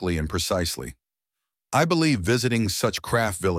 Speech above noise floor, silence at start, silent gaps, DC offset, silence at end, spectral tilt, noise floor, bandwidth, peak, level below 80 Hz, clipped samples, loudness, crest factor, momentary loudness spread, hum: 63 dB; 0 s; none; under 0.1%; 0 s; -4.5 dB/octave; -86 dBFS; 16.5 kHz; -6 dBFS; -44 dBFS; under 0.1%; -24 LUFS; 18 dB; 6 LU; none